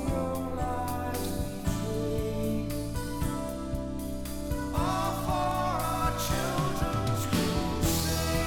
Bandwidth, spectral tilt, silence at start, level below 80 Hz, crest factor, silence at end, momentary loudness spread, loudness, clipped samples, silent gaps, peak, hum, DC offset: 18 kHz; -5 dB/octave; 0 s; -38 dBFS; 14 dB; 0 s; 7 LU; -31 LUFS; under 0.1%; none; -14 dBFS; none; 0.3%